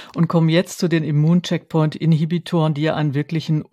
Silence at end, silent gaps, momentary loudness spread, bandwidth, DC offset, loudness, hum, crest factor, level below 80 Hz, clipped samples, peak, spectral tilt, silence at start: 0.1 s; none; 5 LU; 13 kHz; under 0.1%; -19 LUFS; none; 14 dB; -62 dBFS; under 0.1%; -4 dBFS; -7 dB/octave; 0 s